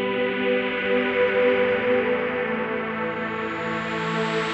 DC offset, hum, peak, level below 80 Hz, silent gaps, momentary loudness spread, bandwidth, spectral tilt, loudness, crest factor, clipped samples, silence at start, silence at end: under 0.1%; none; -10 dBFS; -58 dBFS; none; 7 LU; 8.4 kHz; -6 dB/octave; -23 LUFS; 14 dB; under 0.1%; 0 s; 0 s